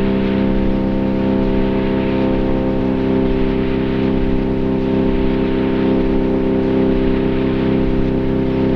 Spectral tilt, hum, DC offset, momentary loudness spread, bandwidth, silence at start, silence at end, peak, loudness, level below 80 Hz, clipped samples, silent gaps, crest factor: -9.5 dB/octave; none; 0.3%; 2 LU; 5.8 kHz; 0 s; 0 s; -4 dBFS; -17 LUFS; -24 dBFS; under 0.1%; none; 12 dB